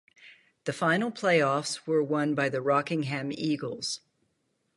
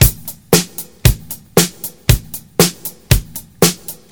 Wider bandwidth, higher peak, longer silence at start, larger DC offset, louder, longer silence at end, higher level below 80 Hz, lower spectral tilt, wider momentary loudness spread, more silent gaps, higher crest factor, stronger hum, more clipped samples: second, 11.5 kHz vs over 20 kHz; second, -10 dBFS vs 0 dBFS; first, 0.2 s vs 0 s; neither; second, -28 LUFS vs -15 LUFS; first, 0.8 s vs 0.2 s; second, -76 dBFS vs -24 dBFS; about the same, -5 dB/octave vs -4 dB/octave; second, 9 LU vs 12 LU; neither; about the same, 18 dB vs 16 dB; neither; neither